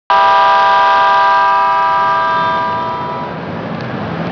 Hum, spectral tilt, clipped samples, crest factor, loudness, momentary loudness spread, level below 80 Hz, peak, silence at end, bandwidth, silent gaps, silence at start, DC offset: none; -5.5 dB/octave; under 0.1%; 10 dB; -12 LUFS; 13 LU; -50 dBFS; -2 dBFS; 0 s; 5.4 kHz; none; 0.1 s; under 0.1%